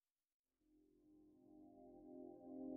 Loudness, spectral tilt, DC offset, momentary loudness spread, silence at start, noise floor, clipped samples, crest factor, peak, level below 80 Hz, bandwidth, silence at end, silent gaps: -60 LUFS; -1.5 dB/octave; under 0.1%; 11 LU; 0.65 s; -79 dBFS; under 0.1%; 18 dB; -40 dBFS; -86 dBFS; 1.6 kHz; 0 s; none